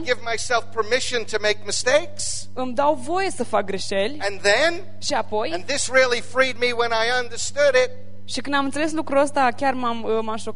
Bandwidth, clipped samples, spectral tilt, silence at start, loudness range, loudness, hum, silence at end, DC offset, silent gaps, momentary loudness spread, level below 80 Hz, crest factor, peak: 11 kHz; under 0.1%; -2.5 dB/octave; 0 s; 2 LU; -22 LUFS; none; 0 s; 4%; none; 8 LU; -54 dBFS; 18 dB; -4 dBFS